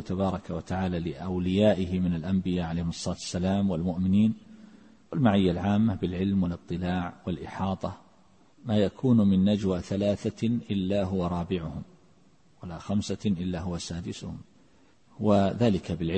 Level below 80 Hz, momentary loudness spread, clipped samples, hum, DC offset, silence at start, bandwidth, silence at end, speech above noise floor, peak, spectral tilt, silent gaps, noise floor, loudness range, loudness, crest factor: -52 dBFS; 12 LU; under 0.1%; none; under 0.1%; 0 s; 8.8 kHz; 0 s; 35 dB; -10 dBFS; -7 dB/octave; none; -62 dBFS; 6 LU; -28 LUFS; 18 dB